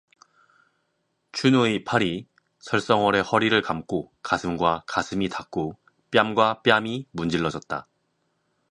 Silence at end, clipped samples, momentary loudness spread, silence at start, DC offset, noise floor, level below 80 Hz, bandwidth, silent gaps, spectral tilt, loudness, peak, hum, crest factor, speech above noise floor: 0.9 s; under 0.1%; 11 LU; 1.35 s; under 0.1%; -74 dBFS; -56 dBFS; 11 kHz; none; -5 dB/octave; -24 LUFS; 0 dBFS; none; 24 dB; 50 dB